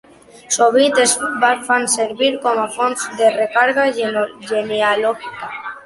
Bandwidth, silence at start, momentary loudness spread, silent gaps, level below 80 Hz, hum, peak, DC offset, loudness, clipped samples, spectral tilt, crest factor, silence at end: 12 kHz; 0.5 s; 9 LU; none; -62 dBFS; none; -2 dBFS; under 0.1%; -16 LUFS; under 0.1%; -1.5 dB/octave; 16 dB; 0.05 s